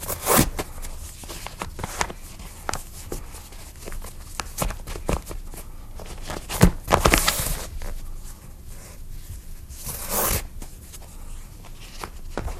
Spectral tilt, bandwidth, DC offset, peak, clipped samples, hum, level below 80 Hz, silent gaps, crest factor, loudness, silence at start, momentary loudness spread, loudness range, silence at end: -3.5 dB/octave; 16 kHz; under 0.1%; 0 dBFS; under 0.1%; none; -32 dBFS; none; 28 dB; -25 LUFS; 0 s; 23 LU; 10 LU; 0 s